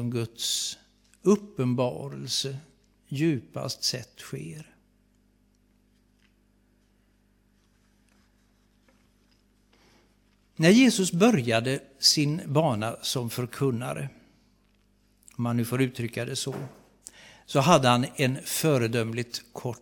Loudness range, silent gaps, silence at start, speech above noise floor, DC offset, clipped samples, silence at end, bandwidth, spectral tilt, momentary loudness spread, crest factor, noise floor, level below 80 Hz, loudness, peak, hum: 10 LU; none; 0 s; 39 dB; under 0.1%; under 0.1%; 0.05 s; 17 kHz; -4.5 dB/octave; 18 LU; 24 dB; -65 dBFS; -66 dBFS; -26 LUFS; -4 dBFS; 50 Hz at -55 dBFS